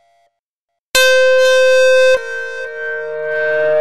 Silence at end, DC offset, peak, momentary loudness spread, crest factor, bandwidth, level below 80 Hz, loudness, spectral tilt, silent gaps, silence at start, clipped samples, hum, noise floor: 0 s; under 0.1%; -2 dBFS; 13 LU; 12 dB; 14 kHz; -52 dBFS; -13 LUFS; 0.5 dB/octave; 0.39-0.68 s, 0.79-0.92 s; 0 s; under 0.1%; none; -78 dBFS